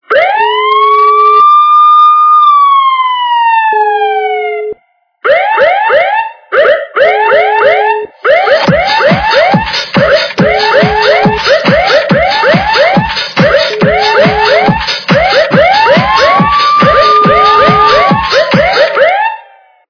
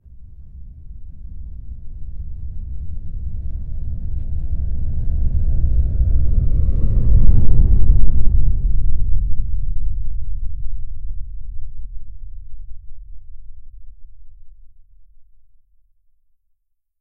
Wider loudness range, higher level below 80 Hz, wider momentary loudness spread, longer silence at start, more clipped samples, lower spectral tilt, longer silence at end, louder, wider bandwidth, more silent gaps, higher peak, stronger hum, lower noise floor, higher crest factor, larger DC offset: second, 4 LU vs 19 LU; second, -34 dBFS vs -18 dBFS; second, 6 LU vs 23 LU; about the same, 0.1 s vs 0.2 s; first, 2% vs 0.2%; second, -5.5 dB/octave vs -13 dB/octave; second, 0.5 s vs 1.55 s; first, -7 LUFS vs -23 LUFS; first, 5.4 kHz vs 0.7 kHz; neither; about the same, 0 dBFS vs 0 dBFS; neither; second, -52 dBFS vs -65 dBFS; second, 8 dB vs 14 dB; neither